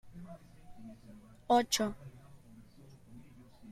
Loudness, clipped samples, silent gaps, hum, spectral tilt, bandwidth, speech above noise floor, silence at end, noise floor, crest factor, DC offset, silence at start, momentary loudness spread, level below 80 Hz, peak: -31 LUFS; under 0.1%; none; none; -3 dB/octave; 15 kHz; 23 dB; 0 s; -57 dBFS; 22 dB; under 0.1%; 0.05 s; 27 LU; -62 dBFS; -16 dBFS